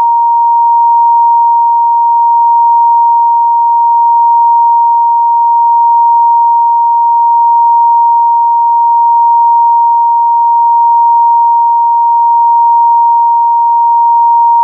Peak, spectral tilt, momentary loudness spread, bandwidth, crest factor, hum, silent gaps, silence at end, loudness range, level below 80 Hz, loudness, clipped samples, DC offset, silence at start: -2 dBFS; 8 dB/octave; 1 LU; 1.1 kHz; 4 dB; none; none; 0 s; 0 LU; under -90 dBFS; -7 LUFS; under 0.1%; under 0.1%; 0 s